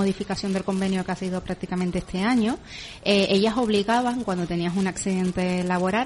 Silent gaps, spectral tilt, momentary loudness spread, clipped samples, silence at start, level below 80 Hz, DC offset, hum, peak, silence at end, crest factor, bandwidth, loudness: none; -5.5 dB/octave; 8 LU; under 0.1%; 0 s; -48 dBFS; under 0.1%; none; -8 dBFS; 0 s; 16 dB; 11.5 kHz; -24 LUFS